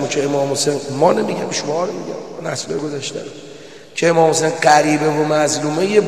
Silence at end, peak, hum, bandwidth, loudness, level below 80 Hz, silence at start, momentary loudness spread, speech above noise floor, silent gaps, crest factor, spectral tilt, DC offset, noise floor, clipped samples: 0 s; 0 dBFS; none; 13 kHz; -17 LUFS; -64 dBFS; 0 s; 16 LU; 21 dB; none; 18 dB; -4 dB/octave; 0.5%; -38 dBFS; under 0.1%